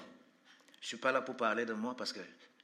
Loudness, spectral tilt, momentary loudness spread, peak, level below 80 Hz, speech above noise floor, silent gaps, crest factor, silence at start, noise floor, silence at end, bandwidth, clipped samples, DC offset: -37 LUFS; -3.5 dB/octave; 16 LU; -16 dBFS; under -90 dBFS; 28 dB; none; 22 dB; 0 s; -65 dBFS; 0.15 s; 14 kHz; under 0.1%; under 0.1%